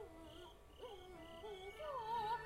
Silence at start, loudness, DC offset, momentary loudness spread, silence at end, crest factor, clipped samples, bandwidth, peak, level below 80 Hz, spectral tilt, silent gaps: 0 s; -50 LUFS; under 0.1%; 14 LU; 0 s; 16 dB; under 0.1%; 16 kHz; -32 dBFS; -66 dBFS; -4.5 dB/octave; none